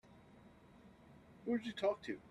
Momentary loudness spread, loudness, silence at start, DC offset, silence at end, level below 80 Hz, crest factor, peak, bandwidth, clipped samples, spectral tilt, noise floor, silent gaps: 24 LU; -41 LUFS; 0.1 s; under 0.1%; 0 s; -74 dBFS; 18 dB; -26 dBFS; 12 kHz; under 0.1%; -6 dB/octave; -63 dBFS; none